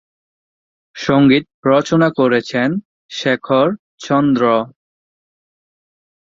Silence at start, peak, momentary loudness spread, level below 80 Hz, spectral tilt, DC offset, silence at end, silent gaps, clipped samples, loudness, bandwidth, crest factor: 0.95 s; -2 dBFS; 11 LU; -56 dBFS; -6.5 dB/octave; under 0.1%; 1.65 s; 1.54-1.63 s, 2.85-3.09 s, 3.79-3.98 s; under 0.1%; -15 LUFS; 7.6 kHz; 16 dB